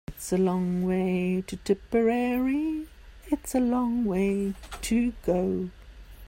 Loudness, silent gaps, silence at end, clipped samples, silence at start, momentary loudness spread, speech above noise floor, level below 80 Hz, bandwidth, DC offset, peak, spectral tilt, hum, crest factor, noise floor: -27 LUFS; none; 0 s; under 0.1%; 0.1 s; 8 LU; 20 dB; -48 dBFS; 16 kHz; under 0.1%; -12 dBFS; -6.5 dB/octave; none; 16 dB; -46 dBFS